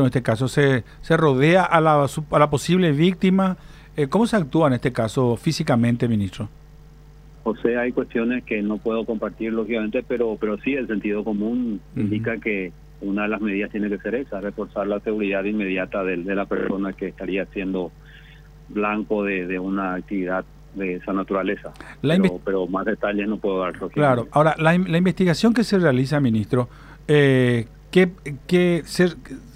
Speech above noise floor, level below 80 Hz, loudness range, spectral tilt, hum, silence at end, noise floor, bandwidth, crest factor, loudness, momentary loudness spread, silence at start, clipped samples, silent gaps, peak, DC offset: 24 dB; -46 dBFS; 7 LU; -7 dB/octave; none; 0 s; -45 dBFS; 15 kHz; 20 dB; -22 LUFS; 10 LU; 0 s; under 0.1%; none; 0 dBFS; under 0.1%